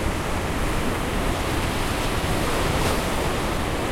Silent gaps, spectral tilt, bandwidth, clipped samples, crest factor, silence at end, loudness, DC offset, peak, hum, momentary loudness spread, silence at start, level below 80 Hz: none; -4.5 dB/octave; 16.5 kHz; under 0.1%; 14 dB; 0 s; -24 LUFS; under 0.1%; -10 dBFS; none; 3 LU; 0 s; -30 dBFS